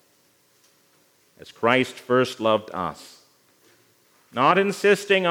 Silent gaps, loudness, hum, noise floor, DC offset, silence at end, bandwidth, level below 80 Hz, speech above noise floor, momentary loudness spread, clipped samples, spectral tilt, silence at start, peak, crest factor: none; -22 LUFS; none; -62 dBFS; under 0.1%; 0 s; 17.5 kHz; -72 dBFS; 40 dB; 12 LU; under 0.1%; -4.5 dB/octave; 1.5 s; -2 dBFS; 22 dB